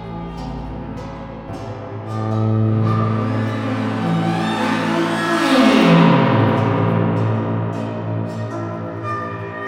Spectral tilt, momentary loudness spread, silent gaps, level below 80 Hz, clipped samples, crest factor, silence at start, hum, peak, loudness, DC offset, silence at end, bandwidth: -7 dB/octave; 17 LU; none; -44 dBFS; under 0.1%; 16 dB; 0 s; none; -2 dBFS; -18 LUFS; under 0.1%; 0 s; 11.5 kHz